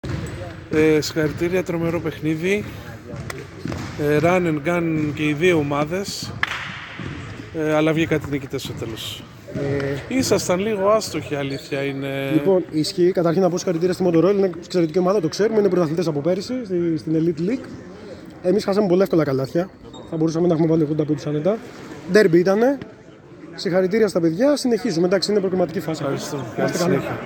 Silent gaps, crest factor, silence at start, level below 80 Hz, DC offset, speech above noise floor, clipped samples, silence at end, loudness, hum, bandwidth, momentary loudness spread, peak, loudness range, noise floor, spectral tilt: none; 20 dB; 0.05 s; -50 dBFS; under 0.1%; 22 dB; under 0.1%; 0 s; -21 LUFS; none; 18 kHz; 14 LU; 0 dBFS; 4 LU; -42 dBFS; -6 dB/octave